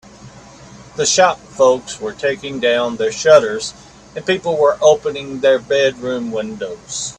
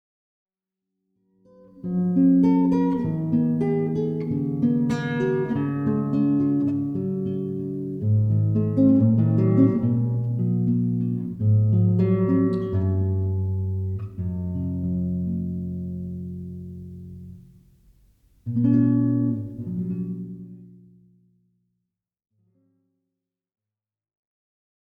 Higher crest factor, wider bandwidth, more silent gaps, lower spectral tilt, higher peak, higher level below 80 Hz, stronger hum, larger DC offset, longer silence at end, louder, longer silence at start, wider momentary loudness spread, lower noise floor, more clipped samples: about the same, 16 dB vs 18 dB; first, 10.5 kHz vs 6.2 kHz; neither; second, -2.5 dB/octave vs -11 dB/octave; first, 0 dBFS vs -6 dBFS; about the same, -52 dBFS vs -52 dBFS; neither; neither; second, 0.05 s vs 4.35 s; first, -16 LUFS vs -23 LUFS; second, 0.2 s vs 1.75 s; about the same, 14 LU vs 14 LU; second, -39 dBFS vs under -90 dBFS; neither